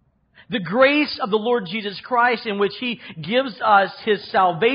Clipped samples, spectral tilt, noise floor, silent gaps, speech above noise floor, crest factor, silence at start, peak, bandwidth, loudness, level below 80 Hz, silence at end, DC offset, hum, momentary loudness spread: under 0.1%; -9.5 dB/octave; -54 dBFS; none; 34 dB; 18 dB; 0.5 s; -2 dBFS; 5.4 kHz; -20 LUFS; -62 dBFS; 0 s; under 0.1%; none; 11 LU